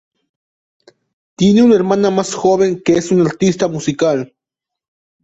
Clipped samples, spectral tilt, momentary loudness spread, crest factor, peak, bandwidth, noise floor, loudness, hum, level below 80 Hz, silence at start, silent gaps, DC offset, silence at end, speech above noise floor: under 0.1%; -6 dB/octave; 7 LU; 14 dB; -2 dBFS; 8.2 kHz; -84 dBFS; -14 LUFS; none; -52 dBFS; 1.4 s; none; under 0.1%; 1 s; 71 dB